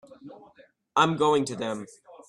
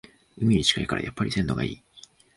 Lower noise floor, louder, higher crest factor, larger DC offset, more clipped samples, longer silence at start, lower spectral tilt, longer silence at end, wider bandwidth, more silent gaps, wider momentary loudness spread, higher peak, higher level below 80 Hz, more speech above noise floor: first, -58 dBFS vs -53 dBFS; about the same, -25 LUFS vs -25 LUFS; about the same, 20 dB vs 22 dB; neither; neither; second, 0.1 s vs 0.35 s; about the same, -5 dB/octave vs -4.5 dB/octave; second, 0.1 s vs 0.35 s; about the same, 11.5 kHz vs 11.5 kHz; neither; first, 15 LU vs 10 LU; about the same, -8 dBFS vs -6 dBFS; second, -70 dBFS vs -46 dBFS; first, 33 dB vs 28 dB